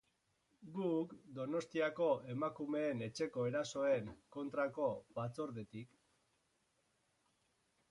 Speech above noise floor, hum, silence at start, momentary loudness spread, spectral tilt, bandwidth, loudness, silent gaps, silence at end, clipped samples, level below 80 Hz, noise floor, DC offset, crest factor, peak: 41 dB; none; 0.6 s; 12 LU; -6 dB/octave; 11.5 kHz; -41 LUFS; none; 2.05 s; under 0.1%; -78 dBFS; -81 dBFS; under 0.1%; 18 dB; -24 dBFS